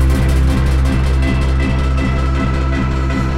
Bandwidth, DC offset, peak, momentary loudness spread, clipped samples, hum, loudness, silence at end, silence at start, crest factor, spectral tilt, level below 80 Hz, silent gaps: 11.5 kHz; under 0.1%; -4 dBFS; 3 LU; under 0.1%; none; -16 LUFS; 0 s; 0 s; 10 dB; -7 dB/octave; -16 dBFS; none